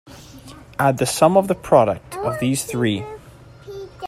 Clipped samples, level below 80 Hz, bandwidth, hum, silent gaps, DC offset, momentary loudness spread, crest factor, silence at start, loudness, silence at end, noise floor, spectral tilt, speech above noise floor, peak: under 0.1%; -50 dBFS; 16 kHz; none; none; under 0.1%; 20 LU; 20 dB; 0.05 s; -19 LUFS; 0 s; -43 dBFS; -5 dB/octave; 25 dB; 0 dBFS